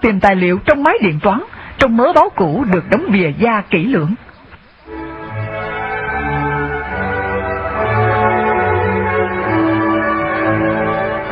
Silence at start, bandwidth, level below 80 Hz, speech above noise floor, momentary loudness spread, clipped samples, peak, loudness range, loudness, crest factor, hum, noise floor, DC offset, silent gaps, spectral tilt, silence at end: 0 s; 7.8 kHz; -36 dBFS; 29 dB; 10 LU; under 0.1%; 0 dBFS; 7 LU; -15 LUFS; 16 dB; none; -41 dBFS; under 0.1%; none; -8 dB/octave; 0 s